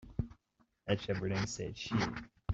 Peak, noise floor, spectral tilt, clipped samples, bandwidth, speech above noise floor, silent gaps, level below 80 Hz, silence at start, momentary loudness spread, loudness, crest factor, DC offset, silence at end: -18 dBFS; -75 dBFS; -5.5 dB/octave; under 0.1%; 8.2 kHz; 39 dB; none; -54 dBFS; 0 s; 10 LU; -38 LUFS; 20 dB; under 0.1%; 0 s